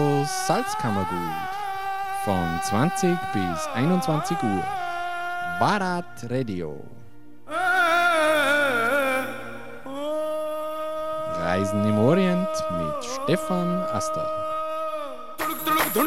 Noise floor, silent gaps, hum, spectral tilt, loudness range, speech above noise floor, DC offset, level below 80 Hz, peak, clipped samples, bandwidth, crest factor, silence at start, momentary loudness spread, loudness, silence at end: -47 dBFS; none; none; -5 dB/octave; 4 LU; 22 dB; 1%; -56 dBFS; -6 dBFS; under 0.1%; 16 kHz; 18 dB; 0 s; 11 LU; -24 LUFS; 0 s